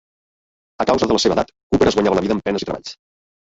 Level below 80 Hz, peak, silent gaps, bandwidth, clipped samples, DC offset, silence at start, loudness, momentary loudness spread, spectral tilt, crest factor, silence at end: -44 dBFS; -2 dBFS; 1.63-1.70 s; 8 kHz; under 0.1%; under 0.1%; 0.8 s; -18 LUFS; 11 LU; -5 dB/octave; 18 dB; 0.45 s